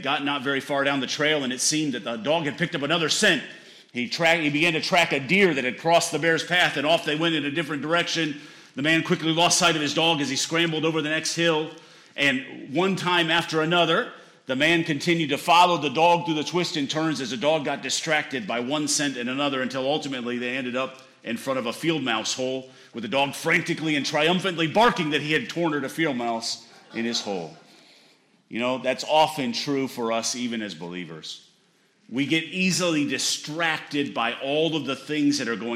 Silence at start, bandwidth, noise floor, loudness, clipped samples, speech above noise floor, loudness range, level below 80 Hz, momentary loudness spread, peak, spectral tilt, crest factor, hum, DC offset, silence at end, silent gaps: 0 s; 16 kHz; -63 dBFS; -23 LUFS; under 0.1%; 39 dB; 6 LU; -68 dBFS; 11 LU; -8 dBFS; -3.5 dB/octave; 16 dB; none; under 0.1%; 0 s; none